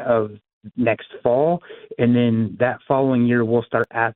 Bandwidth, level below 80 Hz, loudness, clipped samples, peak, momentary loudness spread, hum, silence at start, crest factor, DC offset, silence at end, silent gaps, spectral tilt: 4 kHz; -58 dBFS; -20 LUFS; under 0.1%; -4 dBFS; 7 LU; none; 0 s; 16 dB; under 0.1%; 0.05 s; 0.53-0.61 s; -10.5 dB/octave